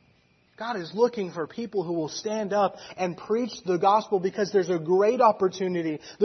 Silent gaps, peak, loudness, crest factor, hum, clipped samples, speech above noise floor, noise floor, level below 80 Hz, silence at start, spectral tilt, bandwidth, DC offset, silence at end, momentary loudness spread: none; -6 dBFS; -26 LUFS; 18 dB; none; under 0.1%; 38 dB; -63 dBFS; -72 dBFS; 0.6 s; -5.5 dB/octave; 6.4 kHz; under 0.1%; 0 s; 11 LU